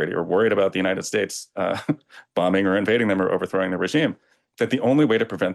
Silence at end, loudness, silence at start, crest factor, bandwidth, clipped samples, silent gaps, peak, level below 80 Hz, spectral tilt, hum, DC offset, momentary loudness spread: 0 s; -22 LUFS; 0 s; 12 dB; 12.5 kHz; under 0.1%; none; -10 dBFS; -66 dBFS; -5.5 dB/octave; none; under 0.1%; 9 LU